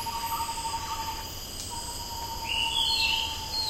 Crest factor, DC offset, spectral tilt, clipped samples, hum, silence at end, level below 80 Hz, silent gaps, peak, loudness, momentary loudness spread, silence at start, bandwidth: 18 dB; under 0.1%; -1 dB/octave; under 0.1%; none; 0 s; -44 dBFS; none; -14 dBFS; -29 LUFS; 11 LU; 0 s; 16 kHz